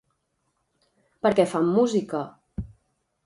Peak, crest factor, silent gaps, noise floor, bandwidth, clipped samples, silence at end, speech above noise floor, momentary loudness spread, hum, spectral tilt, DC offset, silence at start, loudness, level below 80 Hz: -6 dBFS; 20 dB; none; -74 dBFS; 11.5 kHz; under 0.1%; 0.6 s; 52 dB; 17 LU; none; -6.5 dB/octave; under 0.1%; 1.25 s; -23 LUFS; -50 dBFS